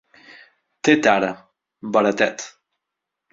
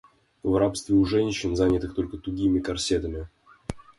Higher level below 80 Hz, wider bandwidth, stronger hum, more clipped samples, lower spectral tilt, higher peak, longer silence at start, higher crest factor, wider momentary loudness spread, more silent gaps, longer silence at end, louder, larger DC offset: second, -62 dBFS vs -42 dBFS; second, 7.8 kHz vs 11.5 kHz; neither; neither; second, -4 dB/octave vs -5.5 dB/octave; first, -2 dBFS vs -10 dBFS; first, 0.85 s vs 0.45 s; first, 22 dB vs 16 dB; first, 21 LU vs 16 LU; neither; first, 0.85 s vs 0.15 s; first, -19 LUFS vs -25 LUFS; neither